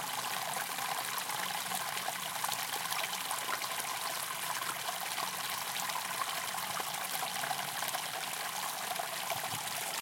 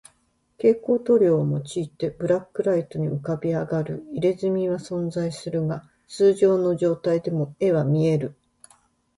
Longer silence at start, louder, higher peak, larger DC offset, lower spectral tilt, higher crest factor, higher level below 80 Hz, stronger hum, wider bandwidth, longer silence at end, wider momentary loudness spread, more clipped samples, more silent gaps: second, 0 s vs 0.65 s; second, -35 LUFS vs -23 LUFS; second, -14 dBFS vs -8 dBFS; neither; second, 0 dB/octave vs -8 dB/octave; first, 22 dB vs 16 dB; second, -88 dBFS vs -60 dBFS; neither; first, 17 kHz vs 11.5 kHz; second, 0 s vs 0.85 s; second, 2 LU vs 10 LU; neither; neither